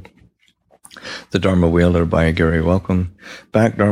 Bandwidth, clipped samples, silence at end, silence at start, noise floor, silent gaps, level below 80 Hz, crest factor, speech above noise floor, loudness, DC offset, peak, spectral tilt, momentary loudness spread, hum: 11 kHz; under 0.1%; 0 s; 0.95 s; -57 dBFS; none; -34 dBFS; 16 dB; 41 dB; -17 LUFS; under 0.1%; -2 dBFS; -7.5 dB/octave; 17 LU; none